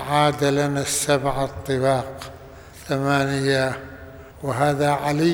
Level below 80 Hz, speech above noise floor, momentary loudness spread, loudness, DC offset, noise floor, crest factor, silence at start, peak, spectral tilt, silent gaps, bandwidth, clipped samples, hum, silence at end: -46 dBFS; 21 dB; 20 LU; -22 LUFS; under 0.1%; -42 dBFS; 18 dB; 0 s; -4 dBFS; -5 dB/octave; none; over 20 kHz; under 0.1%; none; 0 s